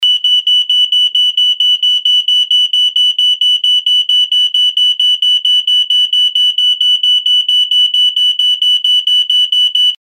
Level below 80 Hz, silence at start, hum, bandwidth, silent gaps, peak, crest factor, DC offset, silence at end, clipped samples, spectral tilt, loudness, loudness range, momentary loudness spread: -82 dBFS; 0 s; 50 Hz at -80 dBFS; 16 kHz; none; -2 dBFS; 8 dB; under 0.1%; 0.05 s; under 0.1%; 7 dB/octave; -8 LUFS; 0 LU; 1 LU